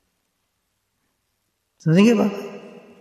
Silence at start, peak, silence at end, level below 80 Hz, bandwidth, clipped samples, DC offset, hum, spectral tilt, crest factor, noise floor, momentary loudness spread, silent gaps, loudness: 1.85 s; -4 dBFS; 0.3 s; -68 dBFS; 13 kHz; under 0.1%; under 0.1%; none; -7 dB/octave; 18 dB; -73 dBFS; 19 LU; none; -18 LUFS